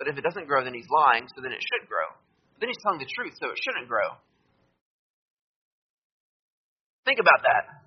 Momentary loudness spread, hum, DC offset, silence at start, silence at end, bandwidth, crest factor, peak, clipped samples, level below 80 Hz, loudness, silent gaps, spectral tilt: 13 LU; none; under 0.1%; 0 s; 0.1 s; 6.2 kHz; 24 dB; -4 dBFS; under 0.1%; -76 dBFS; -25 LUFS; 4.81-7.03 s; 0 dB/octave